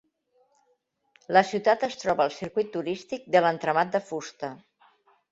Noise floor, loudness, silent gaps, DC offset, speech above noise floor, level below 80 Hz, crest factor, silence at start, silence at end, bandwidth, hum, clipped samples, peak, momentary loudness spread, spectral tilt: -72 dBFS; -26 LUFS; none; under 0.1%; 46 dB; -70 dBFS; 22 dB; 1.3 s; 0.75 s; 8 kHz; none; under 0.1%; -6 dBFS; 13 LU; -5 dB/octave